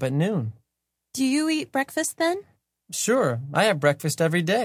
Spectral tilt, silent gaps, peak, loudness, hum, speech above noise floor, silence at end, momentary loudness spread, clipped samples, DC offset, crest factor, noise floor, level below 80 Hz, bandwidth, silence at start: -4.5 dB/octave; none; -4 dBFS; -24 LUFS; none; 58 dB; 0 s; 9 LU; under 0.1%; under 0.1%; 20 dB; -82 dBFS; -66 dBFS; 16 kHz; 0 s